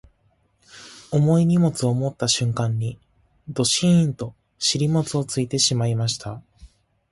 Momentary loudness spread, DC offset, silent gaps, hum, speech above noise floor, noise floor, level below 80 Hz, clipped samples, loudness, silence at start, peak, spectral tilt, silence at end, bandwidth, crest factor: 16 LU; under 0.1%; none; none; 44 dB; -64 dBFS; -54 dBFS; under 0.1%; -21 LUFS; 0.75 s; -6 dBFS; -5 dB/octave; 0.45 s; 11.5 kHz; 16 dB